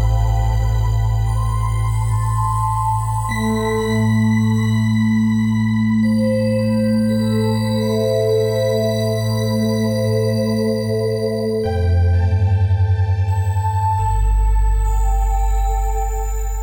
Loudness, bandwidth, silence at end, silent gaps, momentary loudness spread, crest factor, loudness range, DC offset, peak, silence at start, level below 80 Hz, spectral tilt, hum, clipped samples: -18 LUFS; over 20 kHz; 0 s; none; 4 LU; 10 dB; 2 LU; under 0.1%; -6 dBFS; 0 s; -22 dBFS; -7 dB/octave; none; under 0.1%